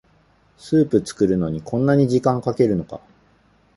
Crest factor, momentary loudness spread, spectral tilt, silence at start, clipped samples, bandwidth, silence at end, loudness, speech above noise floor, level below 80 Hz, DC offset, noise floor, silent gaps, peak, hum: 18 dB; 8 LU; -8 dB/octave; 0.65 s; under 0.1%; 11.5 kHz; 0.8 s; -20 LUFS; 39 dB; -50 dBFS; under 0.1%; -57 dBFS; none; -2 dBFS; none